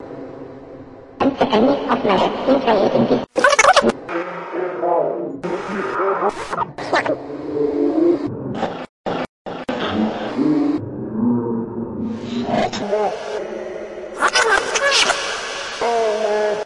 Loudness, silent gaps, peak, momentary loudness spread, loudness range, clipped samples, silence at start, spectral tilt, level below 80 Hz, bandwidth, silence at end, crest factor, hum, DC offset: -19 LUFS; 8.89-9.04 s, 9.29-9.45 s; 0 dBFS; 12 LU; 6 LU; under 0.1%; 0 s; -3.5 dB/octave; -52 dBFS; 11.5 kHz; 0 s; 18 dB; none; under 0.1%